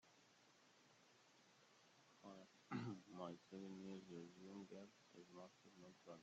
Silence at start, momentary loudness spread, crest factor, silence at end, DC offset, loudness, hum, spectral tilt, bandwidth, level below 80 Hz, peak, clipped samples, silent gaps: 0.05 s; 13 LU; 22 dB; 0 s; under 0.1%; -58 LUFS; none; -5.5 dB/octave; 8 kHz; under -90 dBFS; -38 dBFS; under 0.1%; none